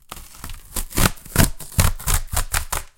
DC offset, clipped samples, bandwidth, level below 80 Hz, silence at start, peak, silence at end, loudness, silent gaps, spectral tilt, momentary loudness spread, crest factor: under 0.1%; under 0.1%; 17.5 kHz; -26 dBFS; 0.1 s; 0 dBFS; 0.1 s; -22 LUFS; none; -3.5 dB/octave; 17 LU; 22 dB